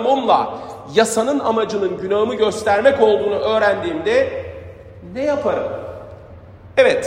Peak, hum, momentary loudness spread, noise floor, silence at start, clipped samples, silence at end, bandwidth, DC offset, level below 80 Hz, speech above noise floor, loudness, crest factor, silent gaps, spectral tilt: 0 dBFS; none; 18 LU; -39 dBFS; 0 s; under 0.1%; 0 s; 15.5 kHz; under 0.1%; -52 dBFS; 23 dB; -18 LUFS; 18 dB; none; -4 dB/octave